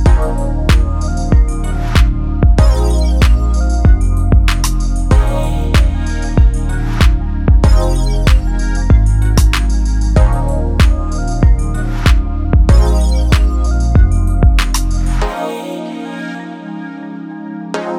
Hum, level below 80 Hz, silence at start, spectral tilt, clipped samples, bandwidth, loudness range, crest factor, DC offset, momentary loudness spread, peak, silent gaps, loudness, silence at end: none; -12 dBFS; 0 s; -6 dB/octave; under 0.1%; 13.5 kHz; 3 LU; 10 dB; under 0.1%; 12 LU; 0 dBFS; none; -14 LUFS; 0 s